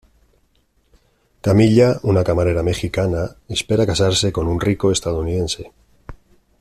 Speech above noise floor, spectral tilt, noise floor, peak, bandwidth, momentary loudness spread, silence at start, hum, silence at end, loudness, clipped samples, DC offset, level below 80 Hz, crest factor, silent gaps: 44 dB; -5.5 dB/octave; -61 dBFS; -2 dBFS; 13.5 kHz; 11 LU; 1.45 s; none; 0.45 s; -18 LUFS; under 0.1%; under 0.1%; -38 dBFS; 16 dB; none